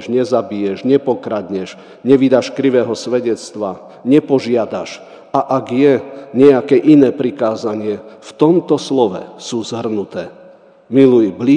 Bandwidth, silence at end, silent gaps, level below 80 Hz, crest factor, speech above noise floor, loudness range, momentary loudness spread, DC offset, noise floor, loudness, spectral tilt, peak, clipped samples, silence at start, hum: 9.8 kHz; 0 s; none; -64 dBFS; 14 dB; 28 dB; 4 LU; 14 LU; under 0.1%; -42 dBFS; -15 LUFS; -6.5 dB/octave; 0 dBFS; 0.2%; 0 s; none